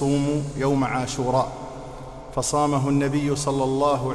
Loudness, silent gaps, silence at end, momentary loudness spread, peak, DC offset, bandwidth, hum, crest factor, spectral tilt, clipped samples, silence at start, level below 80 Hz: -23 LUFS; none; 0 s; 14 LU; -10 dBFS; under 0.1%; 13 kHz; none; 14 dB; -5.5 dB/octave; under 0.1%; 0 s; -44 dBFS